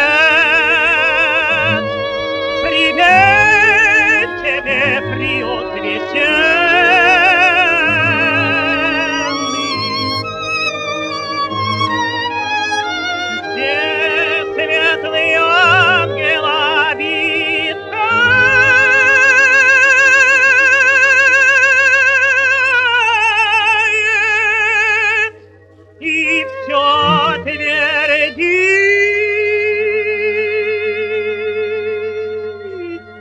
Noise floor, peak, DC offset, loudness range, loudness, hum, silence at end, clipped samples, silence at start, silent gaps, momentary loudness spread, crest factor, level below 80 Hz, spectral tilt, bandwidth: -43 dBFS; 0 dBFS; under 0.1%; 9 LU; -11 LUFS; none; 0 s; under 0.1%; 0 s; none; 11 LU; 12 dB; -48 dBFS; -3 dB/octave; 11.5 kHz